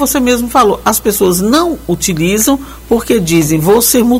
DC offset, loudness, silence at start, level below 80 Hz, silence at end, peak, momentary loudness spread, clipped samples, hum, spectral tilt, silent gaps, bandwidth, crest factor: 0.1%; -11 LUFS; 0 s; -32 dBFS; 0 s; 0 dBFS; 6 LU; under 0.1%; none; -4 dB/octave; none; 16.5 kHz; 10 dB